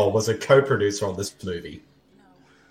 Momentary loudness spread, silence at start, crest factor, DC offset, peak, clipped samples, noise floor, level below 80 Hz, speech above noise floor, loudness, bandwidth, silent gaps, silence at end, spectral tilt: 15 LU; 0 s; 20 dB; under 0.1%; -4 dBFS; under 0.1%; -56 dBFS; -58 dBFS; 34 dB; -22 LUFS; 15 kHz; none; 0.9 s; -5 dB/octave